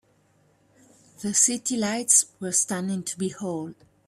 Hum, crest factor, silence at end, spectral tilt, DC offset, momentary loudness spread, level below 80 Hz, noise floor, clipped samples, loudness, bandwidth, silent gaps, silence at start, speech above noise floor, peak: none; 22 dB; 0.35 s; -2.5 dB/octave; under 0.1%; 14 LU; -70 dBFS; -63 dBFS; under 0.1%; -23 LUFS; 15 kHz; none; 1.2 s; 38 dB; -4 dBFS